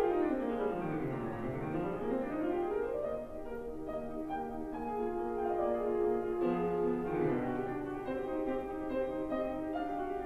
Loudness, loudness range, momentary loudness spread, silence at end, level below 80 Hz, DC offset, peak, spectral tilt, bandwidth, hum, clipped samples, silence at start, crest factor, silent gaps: -36 LUFS; 4 LU; 7 LU; 0 s; -54 dBFS; under 0.1%; -18 dBFS; -8.5 dB/octave; 13 kHz; none; under 0.1%; 0 s; 16 dB; none